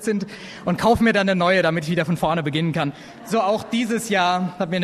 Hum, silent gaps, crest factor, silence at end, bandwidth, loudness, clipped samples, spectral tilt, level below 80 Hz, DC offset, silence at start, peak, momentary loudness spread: none; none; 16 dB; 0 s; 13.5 kHz; -21 LUFS; under 0.1%; -5.5 dB/octave; -48 dBFS; under 0.1%; 0 s; -4 dBFS; 9 LU